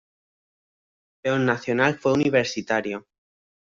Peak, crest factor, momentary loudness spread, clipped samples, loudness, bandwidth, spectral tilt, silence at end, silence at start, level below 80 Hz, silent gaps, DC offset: -4 dBFS; 20 dB; 10 LU; under 0.1%; -23 LUFS; 7.6 kHz; -5.5 dB/octave; 0.7 s; 1.25 s; -64 dBFS; none; under 0.1%